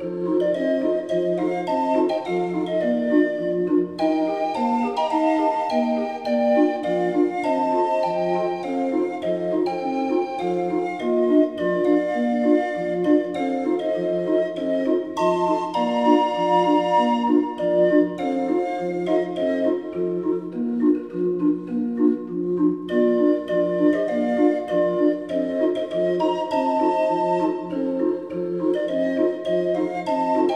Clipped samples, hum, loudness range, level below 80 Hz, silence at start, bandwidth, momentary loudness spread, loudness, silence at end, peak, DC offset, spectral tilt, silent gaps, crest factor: under 0.1%; none; 3 LU; -70 dBFS; 0 s; 9.4 kHz; 6 LU; -22 LUFS; 0 s; -4 dBFS; under 0.1%; -7 dB/octave; none; 16 dB